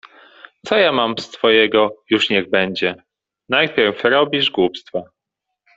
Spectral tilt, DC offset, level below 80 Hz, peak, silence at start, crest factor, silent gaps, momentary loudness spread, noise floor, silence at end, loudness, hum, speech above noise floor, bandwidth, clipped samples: -4.5 dB/octave; under 0.1%; -58 dBFS; -2 dBFS; 0.05 s; 16 dB; none; 12 LU; -80 dBFS; 0.7 s; -17 LUFS; none; 63 dB; 7.8 kHz; under 0.1%